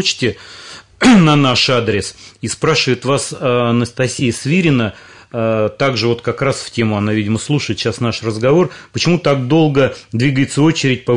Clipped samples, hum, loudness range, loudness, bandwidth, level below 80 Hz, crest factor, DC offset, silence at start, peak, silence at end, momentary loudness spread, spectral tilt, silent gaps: under 0.1%; none; 3 LU; -15 LUFS; 11 kHz; -48 dBFS; 14 dB; 0.2%; 0 s; 0 dBFS; 0 s; 9 LU; -5 dB/octave; none